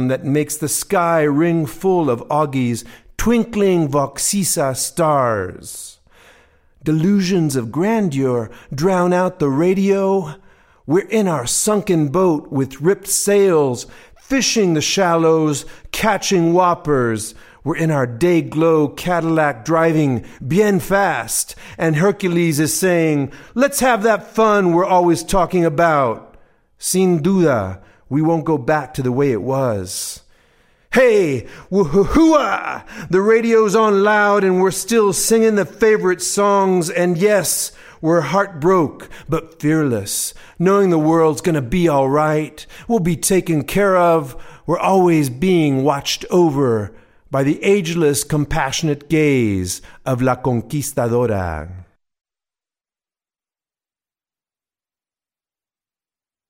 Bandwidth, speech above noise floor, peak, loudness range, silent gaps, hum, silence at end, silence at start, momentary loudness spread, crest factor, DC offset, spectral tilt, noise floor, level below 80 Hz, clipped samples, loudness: 16.5 kHz; over 74 dB; 0 dBFS; 4 LU; none; none; 4.65 s; 0 s; 10 LU; 16 dB; under 0.1%; -5 dB/octave; under -90 dBFS; -42 dBFS; under 0.1%; -16 LUFS